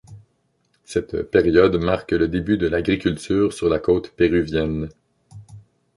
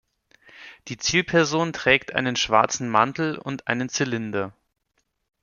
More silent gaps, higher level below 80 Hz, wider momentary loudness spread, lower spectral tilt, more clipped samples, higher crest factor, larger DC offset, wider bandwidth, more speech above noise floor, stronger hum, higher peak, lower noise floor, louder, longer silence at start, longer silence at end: neither; first, -40 dBFS vs -56 dBFS; about the same, 9 LU vs 10 LU; first, -6.5 dB/octave vs -3.5 dB/octave; neither; about the same, 18 dB vs 22 dB; neither; first, 11.5 kHz vs 7.4 kHz; about the same, 47 dB vs 50 dB; neither; about the same, -2 dBFS vs -2 dBFS; second, -66 dBFS vs -73 dBFS; about the same, -20 LUFS vs -22 LUFS; second, 0.1 s vs 0.55 s; second, 0.4 s vs 0.9 s